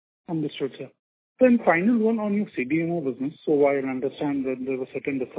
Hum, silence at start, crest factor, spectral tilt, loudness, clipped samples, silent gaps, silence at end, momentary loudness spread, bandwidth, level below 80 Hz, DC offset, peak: none; 0.3 s; 18 dB; -11 dB/octave; -24 LUFS; under 0.1%; 0.99-1.36 s; 0 s; 11 LU; 4 kHz; -68 dBFS; under 0.1%; -6 dBFS